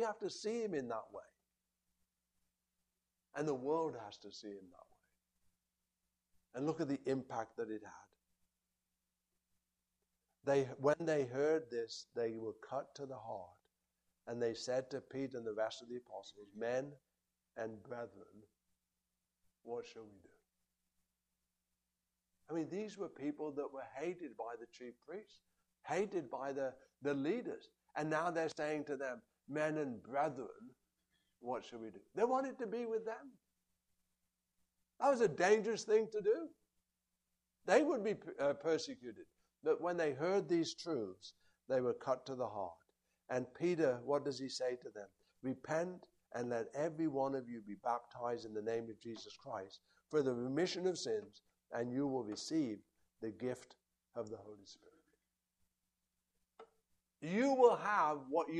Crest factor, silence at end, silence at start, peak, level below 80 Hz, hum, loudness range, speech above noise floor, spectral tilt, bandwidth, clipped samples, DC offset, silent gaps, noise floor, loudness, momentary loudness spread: 24 dB; 0 s; 0 s; -18 dBFS; -84 dBFS; none; 12 LU; 50 dB; -5.5 dB/octave; 11 kHz; under 0.1%; under 0.1%; none; -90 dBFS; -40 LUFS; 17 LU